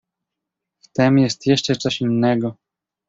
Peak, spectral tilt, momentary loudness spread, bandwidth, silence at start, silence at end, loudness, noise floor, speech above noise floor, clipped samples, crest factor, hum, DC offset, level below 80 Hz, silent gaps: -4 dBFS; -5.5 dB/octave; 8 LU; 8 kHz; 0.95 s; 0.55 s; -19 LUFS; -83 dBFS; 65 dB; under 0.1%; 18 dB; none; under 0.1%; -58 dBFS; none